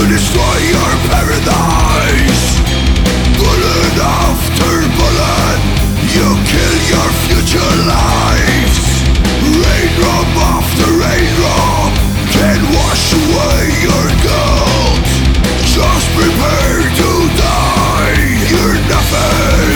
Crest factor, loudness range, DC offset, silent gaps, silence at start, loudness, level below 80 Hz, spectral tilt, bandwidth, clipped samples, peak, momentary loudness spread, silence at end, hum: 10 dB; 0 LU; under 0.1%; none; 0 s; -11 LUFS; -16 dBFS; -4.5 dB/octave; over 20 kHz; under 0.1%; 0 dBFS; 1 LU; 0 s; none